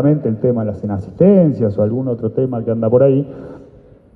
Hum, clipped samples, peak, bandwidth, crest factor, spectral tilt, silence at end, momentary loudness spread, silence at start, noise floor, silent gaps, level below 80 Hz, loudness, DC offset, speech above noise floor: none; under 0.1%; 0 dBFS; 4.4 kHz; 16 dB; -12.5 dB/octave; 0.55 s; 12 LU; 0 s; -44 dBFS; none; -50 dBFS; -15 LUFS; under 0.1%; 29 dB